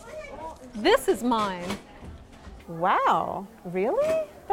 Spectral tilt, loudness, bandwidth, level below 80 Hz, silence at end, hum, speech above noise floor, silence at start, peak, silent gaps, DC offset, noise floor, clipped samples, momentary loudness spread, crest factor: -4.5 dB/octave; -26 LUFS; 17 kHz; -52 dBFS; 0 s; none; 20 dB; 0 s; -8 dBFS; none; under 0.1%; -46 dBFS; under 0.1%; 23 LU; 18 dB